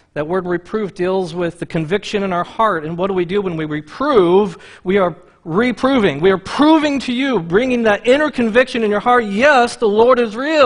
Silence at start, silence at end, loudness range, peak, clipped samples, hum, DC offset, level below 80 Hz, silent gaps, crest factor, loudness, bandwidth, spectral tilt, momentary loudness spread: 0.15 s; 0 s; 5 LU; 0 dBFS; under 0.1%; none; under 0.1%; -46 dBFS; none; 16 dB; -16 LUFS; 10.5 kHz; -6 dB/octave; 9 LU